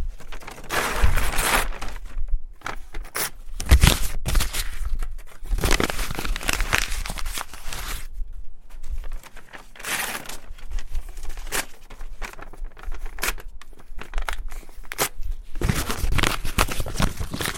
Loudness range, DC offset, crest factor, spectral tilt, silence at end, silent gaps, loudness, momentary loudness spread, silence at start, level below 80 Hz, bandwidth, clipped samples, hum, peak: 9 LU; under 0.1%; 24 dB; -3 dB/octave; 0 s; none; -26 LUFS; 19 LU; 0 s; -26 dBFS; 17 kHz; under 0.1%; none; 0 dBFS